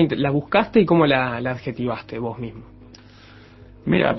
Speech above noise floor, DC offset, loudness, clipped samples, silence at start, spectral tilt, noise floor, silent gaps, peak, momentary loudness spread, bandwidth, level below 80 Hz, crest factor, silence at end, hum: 26 dB; under 0.1%; -20 LUFS; under 0.1%; 0 s; -9 dB/octave; -46 dBFS; none; -2 dBFS; 14 LU; 6 kHz; -48 dBFS; 20 dB; 0 s; 50 Hz at -50 dBFS